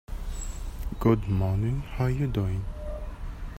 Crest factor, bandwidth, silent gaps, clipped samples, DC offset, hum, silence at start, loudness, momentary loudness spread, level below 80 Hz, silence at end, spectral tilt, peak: 18 dB; 16 kHz; none; under 0.1%; under 0.1%; none; 0.1 s; -29 LUFS; 14 LU; -34 dBFS; 0 s; -7.5 dB/octave; -10 dBFS